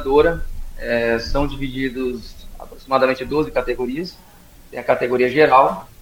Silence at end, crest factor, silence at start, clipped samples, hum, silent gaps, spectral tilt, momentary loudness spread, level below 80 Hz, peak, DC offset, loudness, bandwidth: 0 s; 20 dB; 0 s; under 0.1%; none; none; -6 dB/octave; 19 LU; -32 dBFS; 0 dBFS; under 0.1%; -19 LUFS; 17 kHz